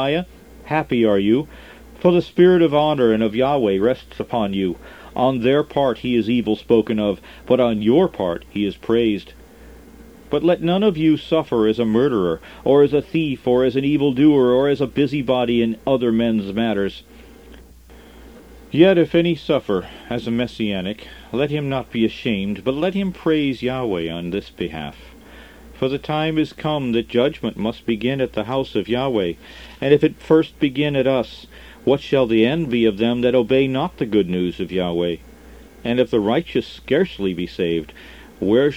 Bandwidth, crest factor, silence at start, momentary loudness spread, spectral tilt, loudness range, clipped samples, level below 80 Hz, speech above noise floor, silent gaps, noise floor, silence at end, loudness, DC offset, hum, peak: 15.5 kHz; 18 dB; 0 s; 10 LU; -7.5 dB/octave; 5 LU; under 0.1%; -46 dBFS; 25 dB; none; -44 dBFS; 0 s; -19 LUFS; 0.1%; none; 0 dBFS